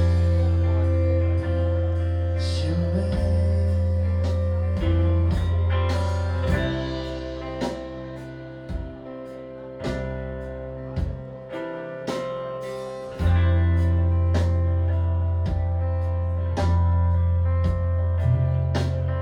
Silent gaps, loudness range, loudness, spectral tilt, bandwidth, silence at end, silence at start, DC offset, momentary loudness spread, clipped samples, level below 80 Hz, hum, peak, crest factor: none; 10 LU; -24 LUFS; -8 dB/octave; 6.8 kHz; 0 s; 0 s; under 0.1%; 13 LU; under 0.1%; -30 dBFS; none; -10 dBFS; 12 dB